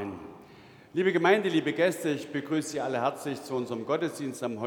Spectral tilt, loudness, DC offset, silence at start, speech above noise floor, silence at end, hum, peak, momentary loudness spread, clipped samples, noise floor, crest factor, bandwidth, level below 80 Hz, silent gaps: -5 dB/octave; -29 LUFS; under 0.1%; 0 s; 24 dB; 0 s; none; -8 dBFS; 12 LU; under 0.1%; -52 dBFS; 22 dB; 19.5 kHz; -74 dBFS; none